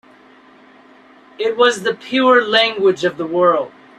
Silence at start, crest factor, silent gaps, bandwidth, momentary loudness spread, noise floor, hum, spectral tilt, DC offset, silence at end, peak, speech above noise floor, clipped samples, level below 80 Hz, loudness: 1.4 s; 16 dB; none; 12.5 kHz; 9 LU; -46 dBFS; none; -3.5 dB/octave; under 0.1%; 0.3 s; -2 dBFS; 31 dB; under 0.1%; -66 dBFS; -15 LUFS